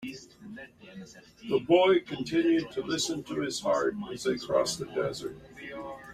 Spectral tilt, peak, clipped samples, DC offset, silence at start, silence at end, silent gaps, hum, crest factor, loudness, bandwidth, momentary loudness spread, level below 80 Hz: -4 dB/octave; -10 dBFS; under 0.1%; under 0.1%; 0 s; 0 s; none; none; 20 dB; -28 LUFS; 15 kHz; 22 LU; -64 dBFS